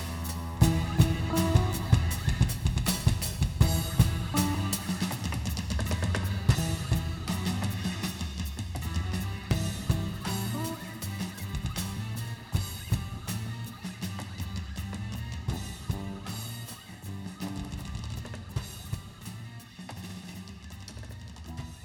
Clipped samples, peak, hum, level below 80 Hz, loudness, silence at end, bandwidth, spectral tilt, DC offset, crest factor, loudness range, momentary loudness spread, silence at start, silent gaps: under 0.1%; -8 dBFS; none; -38 dBFS; -31 LUFS; 0 s; 19.5 kHz; -5 dB/octave; under 0.1%; 22 dB; 12 LU; 16 LU; 0 s; none